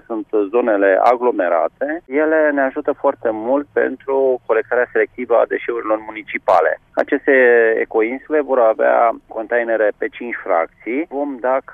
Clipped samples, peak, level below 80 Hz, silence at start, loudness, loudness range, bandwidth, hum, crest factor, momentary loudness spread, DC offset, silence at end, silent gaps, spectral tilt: under 0.1%; -2 dBFS; -60 dBFS; 0.1 s; -17 LUFS; 3 LU; 5.6 kHz; none; 14 dB; 9 LU; under 0.1%; 0 s; none; -6.5 dB/octave